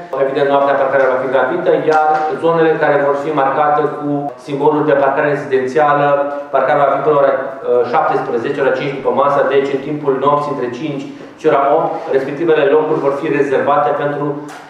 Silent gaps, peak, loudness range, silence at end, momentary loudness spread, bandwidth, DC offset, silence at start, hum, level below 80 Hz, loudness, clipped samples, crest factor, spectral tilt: none; 0 dBFS; 2 LU; 0 s; 7 LU; 9.4 kHz; under 0.1%; 0 s; none; -64 dBFS; -14 LUFS; under 0.1%; 14 dB; -7 dB/octave